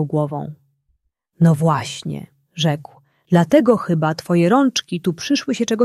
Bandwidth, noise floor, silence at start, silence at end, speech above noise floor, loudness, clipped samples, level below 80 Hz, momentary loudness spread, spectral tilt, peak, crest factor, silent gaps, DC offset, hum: 13 kHz; -67 dBFS; 0 s; 0 s; 50 dB; -18 LUFS; under 0.1%; -60 dBFS; 14 LU; -6 dB/octave; -2 dBFS; 16 dB; none; under 0.1%; none